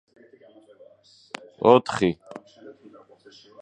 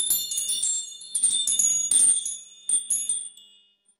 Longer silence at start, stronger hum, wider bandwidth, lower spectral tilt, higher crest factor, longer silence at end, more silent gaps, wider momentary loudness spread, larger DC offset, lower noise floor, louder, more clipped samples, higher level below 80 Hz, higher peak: first, 1.6 s vs 0 s; neither; second, 9.4 kHz vs 16 kHz; first, -6 dB/octave vs 3 dB/octave; first, 26 dB vs 18 dB; first, 0.9 s vs 0.7 s; neither; first, 24 LU vs 12 LU; neither; second, -53 dBFS vs -60 dBFS; about the same, -21 LUFS vs -21 LUFS; neither; first, -62 dBFS vs -68 dBFS; first, -2 dBFS vs -8 dBFS